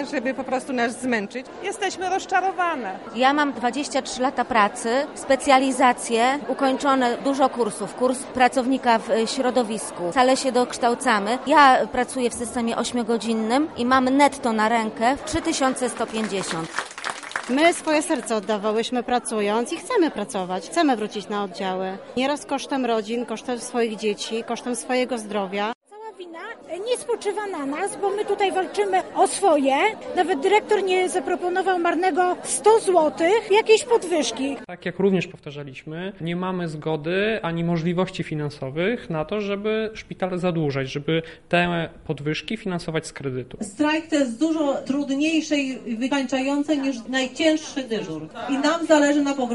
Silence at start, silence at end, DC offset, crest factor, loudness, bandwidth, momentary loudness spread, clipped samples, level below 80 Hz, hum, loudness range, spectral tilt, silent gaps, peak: 0 s; 0 s; under 0.1%; 18 dB; -22 LUFS; 11.5 kHz; 10 LU; under 0.1%; -56 dBFS; none; 6 LU; -4.5 dB/octave; 25.75-25.81 s; -4 dBFS